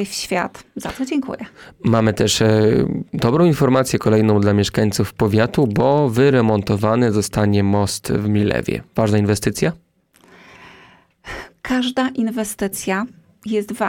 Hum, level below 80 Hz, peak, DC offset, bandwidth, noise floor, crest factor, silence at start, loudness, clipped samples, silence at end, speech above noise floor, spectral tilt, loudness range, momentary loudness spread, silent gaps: none; -44 dBFS; -4 dBFS; under 0.1%; 17.5 kHz; -53 dBFS; 14 dB; 0 s; -18 LUFS; under 0.1%; 0 s; 36 dB; -6 dB/octave; 8 LU; 11 LU; none